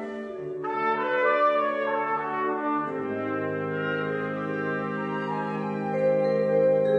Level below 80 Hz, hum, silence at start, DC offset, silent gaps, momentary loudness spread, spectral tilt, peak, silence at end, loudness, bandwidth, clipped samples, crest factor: -72 dBFS; none; 0 s; under 0.1%; none; 8 LU; -8 dB/octave; -12 dBFS; 0 s; -27 LUFS; 6.2 kHz; under 0.1%; 14 dB